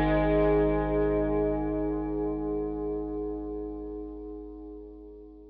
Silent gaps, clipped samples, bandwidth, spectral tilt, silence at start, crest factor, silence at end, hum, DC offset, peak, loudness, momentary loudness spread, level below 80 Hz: none; under 0.1%; 4.6 kHz; -7.5 dB/octave; 0 s; 16 dB; 0 s; 50 Hz at -80 dBFS; under 0.1%; -14 dBFS; -29 LUFS; 19 LU; -40 dBFS